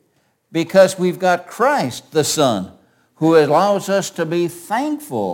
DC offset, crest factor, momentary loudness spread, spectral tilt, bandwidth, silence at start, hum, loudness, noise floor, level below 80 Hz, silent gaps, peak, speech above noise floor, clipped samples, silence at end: under 0.1%; 18 dB; 10 LU; -4.5 dB/octave; 17 kHz; 0.55 s; none; -17 LUFS; -63 dBFS; -64 dBFS; none; 0 dBFS; 46 dB; under 0.1%; 0 s